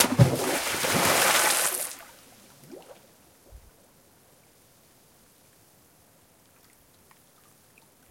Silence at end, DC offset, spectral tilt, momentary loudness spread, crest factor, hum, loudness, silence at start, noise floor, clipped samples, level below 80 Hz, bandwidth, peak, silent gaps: 4.55 s; under 0.1%; -3 dB/octave; 28 LU; 30 dB; none; -23 LUFS; 0 s; -59 dBFS; under 0.1%; -56 dBFS; 16.5 kHz; 0 dBFS; none